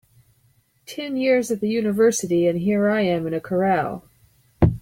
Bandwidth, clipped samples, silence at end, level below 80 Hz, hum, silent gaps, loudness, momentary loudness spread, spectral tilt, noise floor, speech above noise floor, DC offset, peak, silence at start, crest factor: 16.5 kHz; under 0.1%; 0 s; -44 dBFS; none; none; -21 LUFS; 11 LU; -6 dB/octave; -62 dBFS; 41 dB; under 0.1%; -2 dBFS; 0.9 s; 20 dB